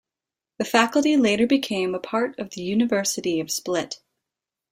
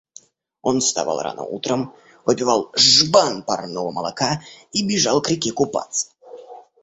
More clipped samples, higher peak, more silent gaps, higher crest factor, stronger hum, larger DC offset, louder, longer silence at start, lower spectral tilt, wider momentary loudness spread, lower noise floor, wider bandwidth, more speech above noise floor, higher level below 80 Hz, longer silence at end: neither; about the same, -2 dBFS vs -2 dBFS; neither; about the same, 20 dB vs 20 dB; neither; neither; second, -22 LUFS vs -19 LUFS; about the same, 0.6 s vs 0.65 s; about the same, -3.5 dB/octave vs -3 dB/octave; second, 10 LU vs 14 LU; first, -89 dBFS vs -49 dBFS; first, 16 kHz vs 8.4 kHz; first, 67 dB vs 29 dB; second, -64 dBFS vs -58 dBFS; first, 0.75 s vs 0.2 s